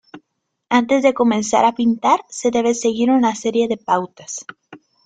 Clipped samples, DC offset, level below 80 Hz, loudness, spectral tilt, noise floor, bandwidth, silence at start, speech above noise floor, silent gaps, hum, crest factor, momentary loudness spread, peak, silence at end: under 0.1%; under 0.1%; -60 dBFS; -17 LUFS; -4 dB/octave; -72 dBFS; 9.4 kHz; 0.15 s; 55 dB; none; none; 16 dB; 13 LU; -2 dBFS; 0.3 s